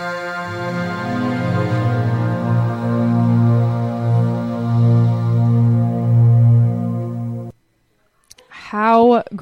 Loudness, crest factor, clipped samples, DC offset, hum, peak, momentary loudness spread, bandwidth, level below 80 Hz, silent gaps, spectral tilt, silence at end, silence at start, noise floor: -17 LUFS; 14 dB; under 0.1%; under 0.1%; none; -2 dBFS; 12 LU; 5.8 kHz; -52 dBFS; none; -9 dB/octave; 0 s; 0 s; -62 dBFS